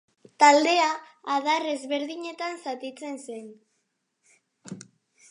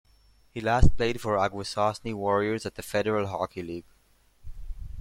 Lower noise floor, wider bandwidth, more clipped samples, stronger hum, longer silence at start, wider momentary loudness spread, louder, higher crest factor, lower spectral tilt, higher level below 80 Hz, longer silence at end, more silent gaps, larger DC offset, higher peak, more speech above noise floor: first, -76 dBFS vs -62 dBFS; second, 11 kHz vs 13.5 kHz; neither; neither; second, 0.4 s vs 0.55 s; first, 24 LU vs 18 LU; first, -24 LUFS vs -28 LUFS; about the same, 24 dB vs 20 dB; second, -2 dB/octave vs -6 dB/octave; second, -86 dBFS vs -36 dBFS; first, 0.5 s vs 0 s; neither; neither; about the same, -4 dBFS vs -6 dBFS; first, 51 dB vs 38 dB